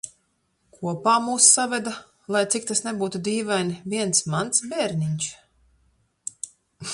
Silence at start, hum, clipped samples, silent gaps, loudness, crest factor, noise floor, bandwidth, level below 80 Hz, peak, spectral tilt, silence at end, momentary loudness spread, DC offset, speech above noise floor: 0.05 s; none; under 0.1%; none; -22 LUFS; 24 dB; -70 dBFS; 11.5 kHz; -64 dBFS; -2 dBFS; -3 dB/octave; 0 s; 22 LU; under 0.1%; 47 dB